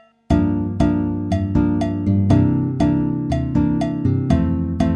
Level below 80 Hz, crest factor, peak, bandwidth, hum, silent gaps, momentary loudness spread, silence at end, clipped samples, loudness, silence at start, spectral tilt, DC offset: -32 dBFS; 14 dB; -4 dBFS; 9.4 kHz; none; none; 5 LU; 0 s; under 0.1%; -19 LUFS; 0.3 s; -9 dB/octave; under 0.1%